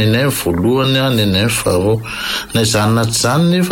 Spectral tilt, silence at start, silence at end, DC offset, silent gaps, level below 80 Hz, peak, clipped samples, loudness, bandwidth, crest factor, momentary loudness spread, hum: -4.5 dB/octave; 0 s; 0 s; under 0.1%; none; -38 dBFS; -4 dBFS; under 0.1%; -14 LUFS; 17 kHz; 10 dB; 4 LU; none